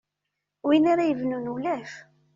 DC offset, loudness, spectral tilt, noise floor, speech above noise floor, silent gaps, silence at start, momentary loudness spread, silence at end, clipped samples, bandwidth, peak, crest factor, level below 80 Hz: under 0.1%; -25 LUFS; -4.5 dB/octave; -83 dBFS; 59 dB; none; 0.65 s; 16 LU; 0.35 s; under 0.1%; 7.4 kHz; -8 dBFS; 18 dB; -70 dBFS